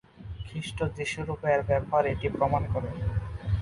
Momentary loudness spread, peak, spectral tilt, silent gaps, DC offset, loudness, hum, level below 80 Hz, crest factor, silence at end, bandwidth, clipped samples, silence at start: 11 LU; -12 dBFS; -6.5 dB/octave; none; under 0.1%; -29 LUFS; none; -40 dBFS; 18 dB; 0 s; 11.5 kHz; under 0.1%; 0.2 s